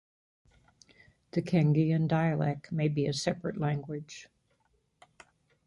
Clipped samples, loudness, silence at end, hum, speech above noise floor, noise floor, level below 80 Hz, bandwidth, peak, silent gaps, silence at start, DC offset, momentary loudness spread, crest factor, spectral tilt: under 0.1%; -30 LUFS; 1.4 s; none; 44 dB; -73 dBFS; -64 dBFS; 11.5 kHz; -12 dBFS; none; 1.35 s; under 0.1%; 14 LU; 20 dB; -7 dB/octave